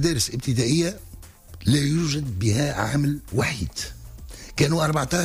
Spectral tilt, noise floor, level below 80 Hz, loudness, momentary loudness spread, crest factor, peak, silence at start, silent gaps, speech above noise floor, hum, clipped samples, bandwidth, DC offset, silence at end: -5 dB/octave; -43 dBFS; -42 dBFS; -23 LUFS; 13 LU; 14 dB; -10 dBFS; 0 s; none; 20 dB; none; under 0.1%; 15.5 kHz; under 0.1%; 0 s